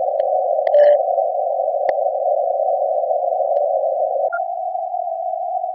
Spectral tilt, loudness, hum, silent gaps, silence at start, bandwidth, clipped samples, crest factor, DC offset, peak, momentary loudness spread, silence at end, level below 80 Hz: 0.5 dB/octave; -19 LUFS; none; none; 0 s; 4.7 kHz; under 0.1%; 14 dB; under 0.1%; -4 dBFS; 10 LU; 0 s; -76 dBFS